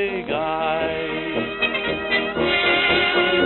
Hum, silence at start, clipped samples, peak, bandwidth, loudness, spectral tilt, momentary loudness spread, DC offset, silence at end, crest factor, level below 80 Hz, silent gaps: none; 0 s; under 0.1%; -6 dBFS; 4.3 kHz; -20 LUFS; -8 dB/octave; 8 LU; under 0.1%; 0 s; 14 dB; -46 dBFS; none